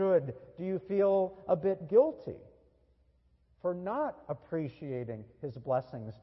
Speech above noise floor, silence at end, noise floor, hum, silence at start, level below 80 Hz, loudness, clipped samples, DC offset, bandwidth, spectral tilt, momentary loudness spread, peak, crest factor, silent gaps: 36 dB; 0.1 s; -68 dBFS; none; 0 s; -68 dBFS; -32 LUFS; under 0.1%; under 0.1%; 5.8 kHz; -11 dB/octave; 16 LU; -14 dBFS; 20 dB; none